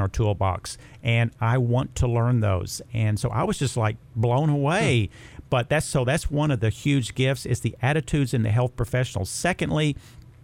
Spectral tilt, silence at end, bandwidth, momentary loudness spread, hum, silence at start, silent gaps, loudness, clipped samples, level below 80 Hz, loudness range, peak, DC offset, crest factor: -6 dB/octave; 0.25 s; 15.5 kHz; 5 LU; none; 0 s; none; -24 LUFS; under 0.1%; -42 dBFS; 1 LU; -8 dBFS; under 0.1%; 16 dB